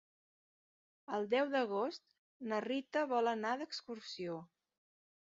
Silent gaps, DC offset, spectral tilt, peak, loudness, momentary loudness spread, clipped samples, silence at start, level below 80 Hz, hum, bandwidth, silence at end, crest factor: 2.19-2.40 s; under 0.1%; -2.5 dB/octave; -22 dBFS; -38 LUFS; 12 LU; under 0.1%; 1.1 s; -88 dBFS; none; 7.4 kHz; 0.75 s; 18 dB